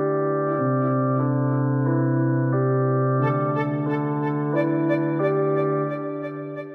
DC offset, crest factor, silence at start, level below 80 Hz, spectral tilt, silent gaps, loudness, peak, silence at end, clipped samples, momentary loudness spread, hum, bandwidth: under 0.1%; 12 dB; 0 s; -68 dBFS; -11.5 dB/octave; none; -23 LUFS; -10 dBFS; 0 s; under 0.1%; 4 LU; none; 3.7 kHz